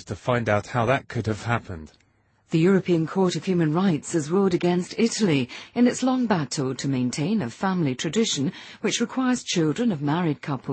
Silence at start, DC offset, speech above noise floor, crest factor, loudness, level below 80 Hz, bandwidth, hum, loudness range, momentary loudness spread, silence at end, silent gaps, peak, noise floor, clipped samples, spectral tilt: 0 s; under 0.1%; 33 dB; 18 dB; -24 LUFS; -58 dBFS; 8.8 kHz; none; 2 LU; 6 LU; 0 s; none; -6 dBFS; -56 dBFS; under 0.1%; -5.5 dB/octave